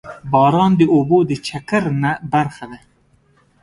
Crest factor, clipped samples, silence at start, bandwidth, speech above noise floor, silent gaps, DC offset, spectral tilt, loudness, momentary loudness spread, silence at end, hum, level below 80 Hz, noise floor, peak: 16 dB; under 0.1%; 0.05 s; 11.5 kHz; 41 dB; none; under 0.1%; -7.5 dB/octave; -16 LUFS; 12 LU; 0.85 s; none; -52 dBFS; -56 dBFS; 0 dBFS